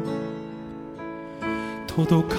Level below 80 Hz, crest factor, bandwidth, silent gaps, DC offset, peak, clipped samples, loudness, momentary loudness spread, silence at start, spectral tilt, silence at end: -52 dBFS; 18 dB; 15.5 kHz; none; under 0.1%; -8 dBFS; under 0.1%; -29 LUFS; 15 LU; 0 s; -7.5 dB/octave; 0 s